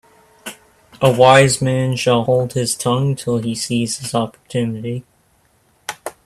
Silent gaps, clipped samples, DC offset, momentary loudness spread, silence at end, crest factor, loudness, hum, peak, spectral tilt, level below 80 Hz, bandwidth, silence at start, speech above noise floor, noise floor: none; under 0.1%; under 0.1%; 20 LU; 0.15 s; 18 dB; -16 LUFS; none; 0 dBFS; -5 dB/octave; -52 dBFS; 14.5 kHz; 0.45 s; 42 dB; -58 dBFS